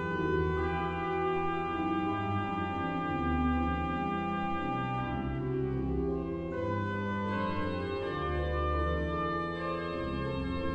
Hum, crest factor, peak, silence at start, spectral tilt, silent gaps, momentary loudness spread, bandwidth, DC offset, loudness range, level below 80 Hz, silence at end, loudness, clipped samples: none; 14 dB; -18 dBFS; 0 s; -8.5 dB/octave; none; 4 LU; 8 kHz; under 0.1%; 2 LU; -42 dBFS; 0 s; -33 LUFS; under 0.1%